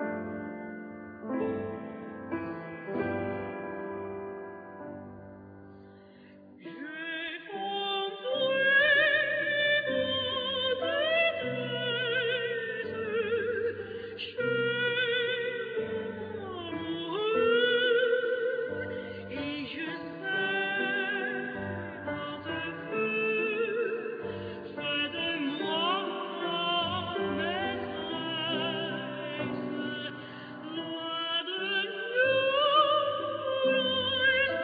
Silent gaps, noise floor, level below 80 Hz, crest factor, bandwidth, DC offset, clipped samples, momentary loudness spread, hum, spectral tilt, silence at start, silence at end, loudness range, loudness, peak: none; -53 dBFS; -68 dBFS; 18 dB; 5 kHz; under 0.1%; under 0.1%; 14 LU; none; -7 dB/octave; 0 s; 0 s; 11 LU; -30 LUFS; -12 dBFS